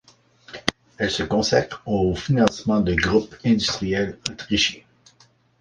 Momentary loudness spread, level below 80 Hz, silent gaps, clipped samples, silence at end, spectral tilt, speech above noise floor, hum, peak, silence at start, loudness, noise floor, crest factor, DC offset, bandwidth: 8 LU; -42 dBFS; none; under 0.1%; 0.8 s; -4.5 dB/octave; 36 dB; none; 0 dBFS; 0.5 s; -22 LUFS; -58 dBFS; 22 dB; under 0.1%; 10.5 kHz